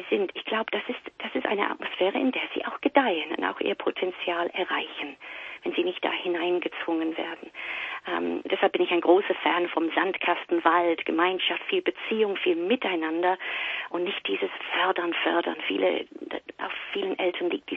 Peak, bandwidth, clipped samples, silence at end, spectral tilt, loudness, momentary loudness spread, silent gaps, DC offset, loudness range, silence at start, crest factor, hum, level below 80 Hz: -6 dBFS; 4.2 kHz; under 0.1%; 0 s; -6 dB/octave; -27 LUFS; 10 LU; none; under 0.1%; 5 LU; 0 s; 22 dB; none; -74 dBFS